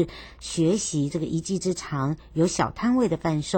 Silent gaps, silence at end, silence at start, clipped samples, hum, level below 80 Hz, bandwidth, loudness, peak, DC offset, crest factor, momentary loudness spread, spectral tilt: none; 0 s; 0 s; under 0.1%; none; -48 dBFS; 17 kHz; -25 LUFS; -8 dBFS; under 0.1%; 16 dB; 5 LU; -5.5 dB/octave